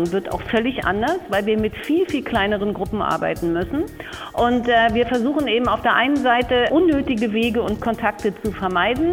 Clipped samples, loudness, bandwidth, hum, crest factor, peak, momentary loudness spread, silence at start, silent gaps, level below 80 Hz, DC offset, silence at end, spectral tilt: under 0.1%; -20 LUFS; 17 kHz; none; 16 dB; -4 dBFS; 7 LU; 0 s; none; -40 dBFS; under 0.1%; 0 s; -6 dB/octave